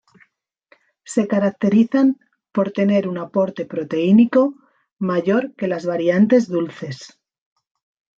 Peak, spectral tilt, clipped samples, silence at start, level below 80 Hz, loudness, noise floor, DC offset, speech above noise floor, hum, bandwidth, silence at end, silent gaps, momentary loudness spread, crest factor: -4 dBFS; -7.5 dB/octave; under 0.1%; 1.1 s; -66 dBFS; -19 LUFS; -60 dBFS; under 0.1%; 43 dB; none; 9.2 kHz; 1.1 s; 4.92-4.97 s; 12 LU; 16 dB